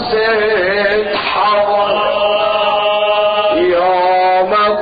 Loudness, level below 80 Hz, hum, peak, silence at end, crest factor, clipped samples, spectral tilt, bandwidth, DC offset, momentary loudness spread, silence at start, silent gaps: -13 LUFS; -46 dBFS; none; -2 dBFS; 0 s; 10 dB; under 0.1%; -7 dB/octave; 5 kHz; under 0.1%; 2 LU; 0 s; none